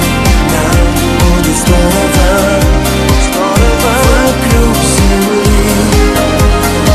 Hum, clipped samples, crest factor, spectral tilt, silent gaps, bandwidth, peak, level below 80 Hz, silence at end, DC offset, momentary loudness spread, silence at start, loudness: none; 0.2%; 8 dB; -5 dB/octave; none; 14.5 kHz; 0 dBFS; -12 dBFS; 0 s; under 0.1%; 1 LU; 0 s; -9 LUFS